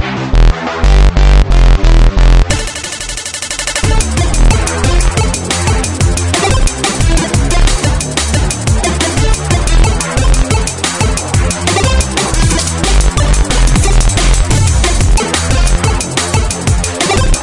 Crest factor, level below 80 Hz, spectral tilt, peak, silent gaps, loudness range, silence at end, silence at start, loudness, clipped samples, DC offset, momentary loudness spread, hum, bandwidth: 10 dB; -12 dBFS; -4 dB/octave; 0 dBFS; none; 1 LU; 0 s; 0 s; -12 LUFS; under 0.1%; under 0.1%; 4 LU; none; 11.5 kHz